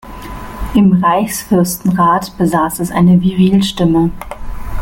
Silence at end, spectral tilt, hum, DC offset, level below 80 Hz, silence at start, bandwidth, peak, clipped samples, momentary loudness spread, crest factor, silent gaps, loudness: 0 s; -6.5 dB/octave; none; under 0.1%; -30 dBFS; 0.05 s; 17 kHz; -2 dBFS; under 0.1%; 18 LU; 12 dB; none; -12 LUFS